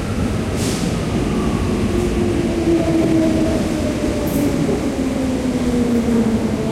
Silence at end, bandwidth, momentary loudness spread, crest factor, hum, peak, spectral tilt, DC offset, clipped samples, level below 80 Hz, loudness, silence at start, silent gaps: 0 s; 16.5 kHz; 4 LU; 12 dB; none; -6 dBFS; -6.5 dB/octave; under 0.1%; under 0.1%; -30 dBFS; -18 LUFS; 0 s; none